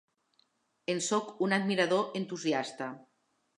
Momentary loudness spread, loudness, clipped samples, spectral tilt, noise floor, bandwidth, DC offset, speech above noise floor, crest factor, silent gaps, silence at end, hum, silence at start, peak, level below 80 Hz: 13 LU; -32 LUFS; under 0.1%; -4 dB/octave; -73 dBFS; 11 kHz; under 0.1%; 42 dB; 20 dB; none; 0.55 s; none; 0.9 s; -14 dBFS; -84 dBFS